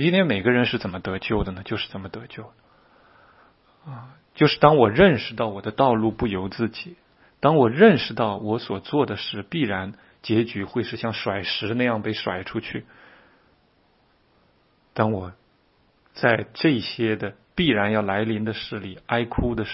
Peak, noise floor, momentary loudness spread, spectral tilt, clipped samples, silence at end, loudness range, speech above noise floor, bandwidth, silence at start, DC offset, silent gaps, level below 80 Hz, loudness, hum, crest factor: 0 dBFS; -62 dBFS; 19 LU; -10 dB/octave; under 0.1%; 0 s; 11 LU; 40 dB; 5.8 kHz; 0 s; under 0.1%; none; -48 dBFS; -22 LUFS; none; 24 dB